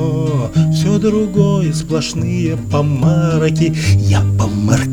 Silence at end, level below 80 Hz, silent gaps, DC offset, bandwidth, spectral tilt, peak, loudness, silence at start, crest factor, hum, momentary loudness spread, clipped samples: 0 s; -36 dBFS; none; under 0.1%; 13 kHz; -6.5 dB/octave; 0 dBFS; -15 LUFS; 0 s; 14 dB; none; 4 LU; under 0.1%